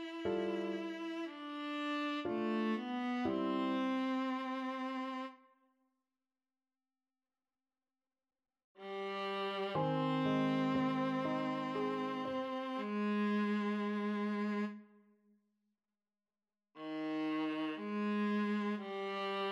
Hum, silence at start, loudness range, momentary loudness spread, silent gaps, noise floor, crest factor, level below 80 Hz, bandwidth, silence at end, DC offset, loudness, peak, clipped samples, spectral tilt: none; 0 s; 9 LU; 8 LU; 8.64-8.75 s; under -90 dBFS; 16 dB; -80 dBFS; 8 kHz; 0 s; under 0.1%; -38 LUFS; -24 dBFS; under 0.1%; -7 dB/octave